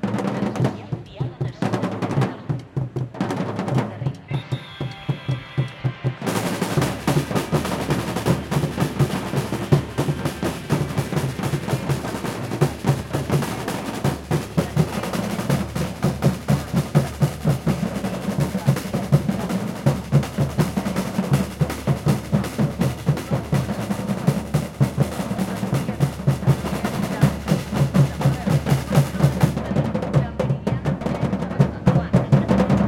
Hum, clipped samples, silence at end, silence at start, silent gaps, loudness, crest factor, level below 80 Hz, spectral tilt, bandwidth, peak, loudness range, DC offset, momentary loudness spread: none; under 0.1%; 0 s; 0 s; none; -23 LUFS; 20 dB; -42 dBFS; -6.5 dB/octave; 16.5 kHz; -2 dBFS; 5 LU; under 0.1%; 7 LU